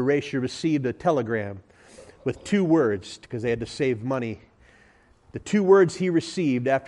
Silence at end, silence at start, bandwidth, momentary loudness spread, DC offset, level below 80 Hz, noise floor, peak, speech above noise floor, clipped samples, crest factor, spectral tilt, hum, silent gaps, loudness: 0 s; 0 s; 11 kHz; 16 LU; under 0.1%; -58 dBFS; -57 dBFS; -6 dBFS; 34 dB; under 0.1%; 18 dB; -6.5 dB/octave; none; none; -24 LUFS